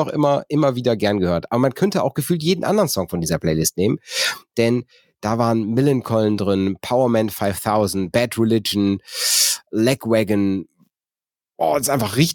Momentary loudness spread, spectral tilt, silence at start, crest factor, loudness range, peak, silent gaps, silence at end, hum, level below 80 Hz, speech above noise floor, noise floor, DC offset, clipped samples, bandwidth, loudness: 4 LU; -4.5 dB/octave; 0 s; 18 dB; 2 LU; -2 dBFS; none; 0 s; none; -50 dBFS; over 71 dB; under -90 dBFS; under 0.1%; under 0.1%; 17.5 kHz; -19 LUFS